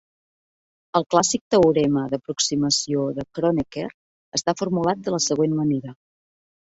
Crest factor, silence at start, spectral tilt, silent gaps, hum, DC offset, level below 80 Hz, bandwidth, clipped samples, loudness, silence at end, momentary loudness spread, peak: 20 dB; 0.95 s; -4.5 dB/octave; 1.41-1.51 s, 3.94-4.32 s; none; under 0.1%; -56 dBFS; 8.4 kHz; under 0.1%; -22 LUFS; 0.8 s; 10 LU; -2 dBFS